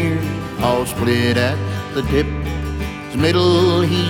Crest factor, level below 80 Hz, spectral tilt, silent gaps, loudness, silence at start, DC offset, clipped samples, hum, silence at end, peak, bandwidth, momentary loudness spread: 14 dB; -32 dBFS; -6 dB/octave; none; -18 LUFS; 0 s; under 0.1%; under 0.1%; none; 0 s; -2 dBFS; 18 kHz; 10 LU